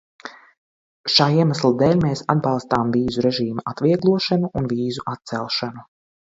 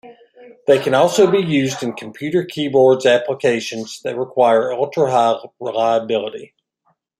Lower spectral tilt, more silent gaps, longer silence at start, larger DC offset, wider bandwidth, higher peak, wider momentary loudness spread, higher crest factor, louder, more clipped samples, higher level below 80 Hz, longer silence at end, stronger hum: first, -6.5 dB/octave vs -5 dB/octave; first, 0.58-1.04 s vs none; first, 0.25 s vs 0.05 s; neither; second, 7.8 kHz vs 14 kHz; about the same, 0 dBFS vs -2 dBFS; about the same, 12 LU vs 12 LU; about the same, 20 dB vs 16 dB; second, -20 LUFS vs -17 LUFS; neither; first, -52 dBFS vs -64 dBFS; second, 0.55 s vs 0.75 s; neither